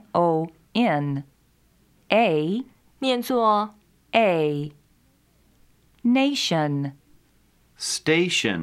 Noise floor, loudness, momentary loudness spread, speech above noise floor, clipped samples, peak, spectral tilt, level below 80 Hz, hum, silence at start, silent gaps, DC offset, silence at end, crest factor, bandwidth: -61 dBFS; -23 LUFS; 11 LU; 39 dB; under 0.1%; -2 dBFS; -4.5 dB/octave; -64 dBFS; none; 0.15 s; none; under 0.1%; 0 s; 22 dB; 15.5 kHz